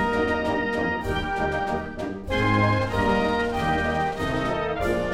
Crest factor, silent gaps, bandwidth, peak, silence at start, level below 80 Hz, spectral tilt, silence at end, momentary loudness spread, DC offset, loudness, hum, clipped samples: 14 dB; none; 15.5 kHz; -10 dBFS; 0 s; -38 dBFS; -6.5 dB/octave; 0 s; 6 LU; under 0.1%; -24 LUFS; none; under 0.1%